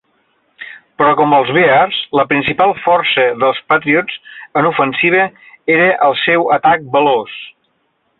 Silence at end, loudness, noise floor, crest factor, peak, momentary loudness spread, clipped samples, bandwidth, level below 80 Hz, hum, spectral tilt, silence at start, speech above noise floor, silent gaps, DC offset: 0.7 s; -12 LUFS; -63 dBFS; 12 dB; -2 dBFS; 14 LU; under 0.1%; 4.3 kHz; -54 dBFS; none; -8.5 dB/octave; 0.6 s; 50 dB; none; under 0.1%